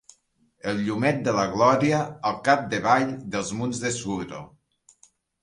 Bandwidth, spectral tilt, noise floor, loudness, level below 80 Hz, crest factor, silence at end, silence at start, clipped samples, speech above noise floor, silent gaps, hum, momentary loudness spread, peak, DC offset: 11.5 kHz; -5 dB/octave; -65 dBFS; -24 LUFS; -58 dBFS; 20 dB; 0.95 s; 0.65 s; under 0.1%; 41 dB; none; none; 11 LU; -4 dBFS; under 0.1%